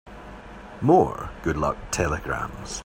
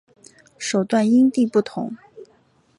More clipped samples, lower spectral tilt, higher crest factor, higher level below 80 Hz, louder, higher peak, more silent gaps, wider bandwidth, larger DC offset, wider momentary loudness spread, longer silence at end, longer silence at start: neither; about the same, -5.5 dB/octave vs -5.5 dB/octave; first, 20 dB vs 14 dB; first, -40 dBFS vs -70 dBFS; second, -24 LUFS vs -20 LUFS; about the same, -4 dBFS vs -6 dBFS; neither; first, 16 kHz vs 11 kHz; neither; first, 23 LU vs 15 LU; second, 0 s vs 0.55 s; second, 0.05 s vs 0.6 s